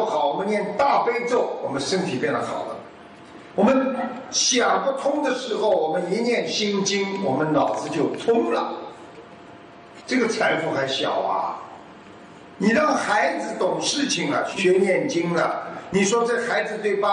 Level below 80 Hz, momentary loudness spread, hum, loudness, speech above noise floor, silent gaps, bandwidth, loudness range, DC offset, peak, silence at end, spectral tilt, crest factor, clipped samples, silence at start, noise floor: -66 dBFS; 11 LU; none; -22 LUFS; 22 dB; none; 10 kHz; 3 LU; under 0.1%; -6 dBFS; 0 s; -3.5 dB/octave; 16 dB; under 0.1%; 0 s; -44 dBFS